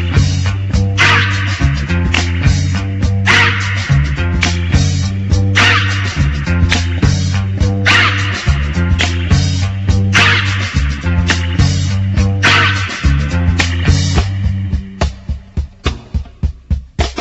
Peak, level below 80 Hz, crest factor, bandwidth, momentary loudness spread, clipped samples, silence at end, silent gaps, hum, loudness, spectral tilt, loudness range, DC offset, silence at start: 0 dBFS; -20 dBFS; 12 dB; 8.2 kHz; 11 LU; under 0.1%; 0 s; none; none; -13 LUFS; -4.5 dB/octave; 4 LU; under 0.1%; 0 s